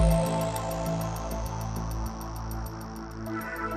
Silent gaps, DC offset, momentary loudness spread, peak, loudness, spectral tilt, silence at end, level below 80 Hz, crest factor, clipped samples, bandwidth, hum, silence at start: none; under 0.1%; 10 LU; -12 dBFS; -32 LUFS; -6 dB/octave; 0 s; -36 dBFS; 18 dB; under 0.1%; 15.5 kHz; none; 0 s